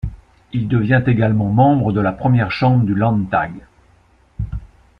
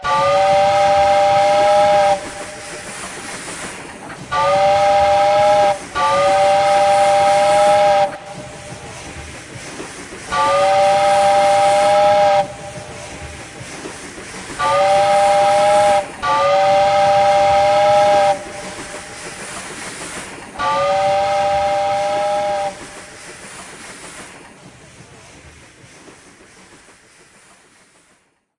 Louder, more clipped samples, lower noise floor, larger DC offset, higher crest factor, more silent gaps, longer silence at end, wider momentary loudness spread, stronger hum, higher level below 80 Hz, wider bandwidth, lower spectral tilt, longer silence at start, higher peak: about the same, -16 LUFS vs -14 LUFS; neither; second, -53 dBFS vs -58 dBFS; neither; about the same, 14 dB vs 14 dB; neither; second, 0.35 s vs 3.1 s; second, 14 LU vs 19 LU; neither; first, -38 dBFS vs -48 dBFS; second, 5.4 kHz vs 11.5 kHz; first, -10 dB/octave vs -3 dB/octave; about the same, 0.05 s vs 0 s; about the same, -2 dBFS vs -4 dBFS